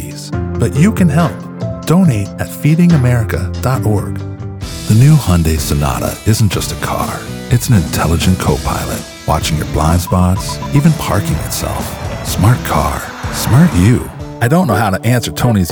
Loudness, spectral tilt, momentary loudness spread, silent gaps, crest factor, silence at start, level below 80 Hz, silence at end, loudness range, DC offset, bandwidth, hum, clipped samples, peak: -14 LUFS; -6 dB/octave; 11 LU; none; 12 dB; 0 s; -26 dBFS; 0 s; 2 LU; under 0.1%; over 20 kHz; none; under 0.1%; 0 dBFS